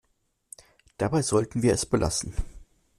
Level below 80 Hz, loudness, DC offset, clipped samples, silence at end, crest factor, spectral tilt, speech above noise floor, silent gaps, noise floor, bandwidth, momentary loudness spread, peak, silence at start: -40 dBFS; -26 LUFS; under 0.1%; under 0.1%; 0.35 s; 18 dB; -5 dB/octave; 48 dB; none; -73 dBFS; 14 kHz; 21 LU; -10 dBFS; 1 s